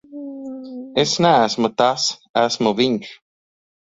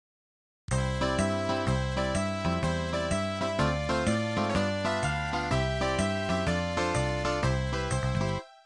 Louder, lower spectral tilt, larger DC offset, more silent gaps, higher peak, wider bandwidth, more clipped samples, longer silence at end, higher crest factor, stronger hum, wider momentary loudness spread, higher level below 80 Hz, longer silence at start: first, -18 LUFS vs -29 LUFS; second, -4 dB/octave vs -5.5 dB/octave; neither; first, 2.29-2.34 s vs none; first, -2 dBFS vs -14 dBFS; second, 7.8 kHz vs 11.5 kHz; neither; first, 0.8 s vs 0.1 s; about the same, 18 dB vs 14 dB; neither; first, 17 LU vs 2 LU; second, -60 dBFS vs -40 dBFS; second, 0.1 s vs 0.7 s